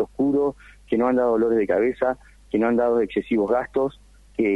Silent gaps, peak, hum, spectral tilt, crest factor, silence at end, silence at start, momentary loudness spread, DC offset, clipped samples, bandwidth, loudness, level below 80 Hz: none; -8 dBFS; none; -8 dB/octave; 14 dB; 0 s; 0 s; 7 LU; under 0.1%; under 0.1%; 11 kHz; -22 LUFS; -50 dBFS